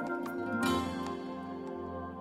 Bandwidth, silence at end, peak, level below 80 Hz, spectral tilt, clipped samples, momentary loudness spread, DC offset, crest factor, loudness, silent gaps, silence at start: 16 kHz; 0 s; -20 dBFS; -60 dBFS; -5.5 dB/octave; under 0.1%; 10 LU; under 0.1%; 16 dB; -36 LUFS; none; 0 s